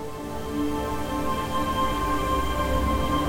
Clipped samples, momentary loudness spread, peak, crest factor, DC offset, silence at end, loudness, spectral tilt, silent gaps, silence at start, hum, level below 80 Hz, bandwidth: under 0.1%; 5 LU; -12 dBFS; 14 dB; 1%; 0 s; -27 LUFS; -5.5 dB/octave; none; 0 s; none; -34 dBFS; over 20 kHz